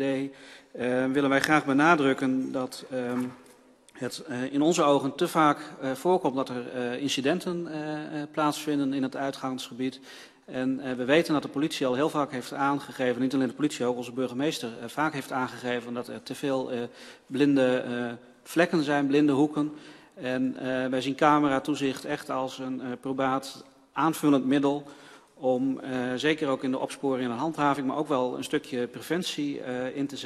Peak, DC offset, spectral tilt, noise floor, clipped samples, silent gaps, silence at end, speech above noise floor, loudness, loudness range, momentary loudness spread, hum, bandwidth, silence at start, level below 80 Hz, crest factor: -4 dBFS; under 0.1%; -5 dB/octave; -56 dBFS; under 0.1%; none; 0 s; 29 dB; -28 LUFS; 4 LU; 11 LU; none; 13.5 kHz; 0 s; -70 dBFS; 22 dB